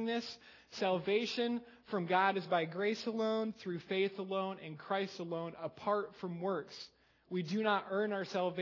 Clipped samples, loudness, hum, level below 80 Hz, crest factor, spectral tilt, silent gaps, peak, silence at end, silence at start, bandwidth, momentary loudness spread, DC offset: under 0.1%; -37 LUFS; none; -82 dBFS; 20 dB; -5.5 dB/octave; none; -16 dBFS; 0 s; 0 s; 6 kHz; 10 LU; under 0.1%